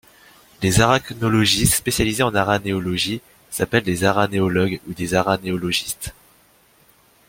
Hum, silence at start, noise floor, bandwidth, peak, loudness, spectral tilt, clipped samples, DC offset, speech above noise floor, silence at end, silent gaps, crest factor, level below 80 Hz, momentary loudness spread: none; 0.6 s; -55 dBFS; 16.5 kHz; 0 dBFS; -19 LUFS; -4 dB/octave; under 0.1%; under 0.1%; 36 dB; 1.2 s; none; 20 dB; -42 dBFS; 10 LU